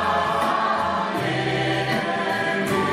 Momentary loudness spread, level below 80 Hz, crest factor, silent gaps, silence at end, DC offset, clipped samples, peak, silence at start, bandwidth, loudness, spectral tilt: 2 LU; -52 dBFS; 14 dB; none; 0 s; under 0.1%; under 0.1%; -10 dBFS; 0 s; 16 kHz; -22 LUFS; -5 dB/octave